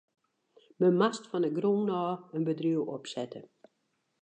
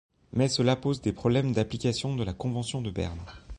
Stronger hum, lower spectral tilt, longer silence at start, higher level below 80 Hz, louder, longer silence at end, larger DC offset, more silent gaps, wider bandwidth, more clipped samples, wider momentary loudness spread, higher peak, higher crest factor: neither; about the same, -6.5 dB/octave vs -6 dB/octave; first, 0.8 s vs 0.35 s; second, -86 dBFS vs -48 dBFS; about the same, -30 LUFS vs -29 LUFS; first, 0.8 s vs 0 s; neither; neither; second, 9.2 kHz vs 11 kHz; neither; first, 12 LU vs 9 LU; about the same, -12 dBFS vs -12 dBFS; about the same, 18 dB vs 16 dB